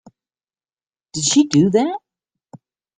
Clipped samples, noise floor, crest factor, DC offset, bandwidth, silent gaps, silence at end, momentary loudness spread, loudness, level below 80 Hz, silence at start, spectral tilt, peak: under 0.1%; under -90 dBFS; 18 dB; under 0.1%; 9.6 kHz; none; 0.4 s; 16 LU; -16 LUFS; -60 dBFS; 1.15 s; -4.5 dB/octave; -2 dBFS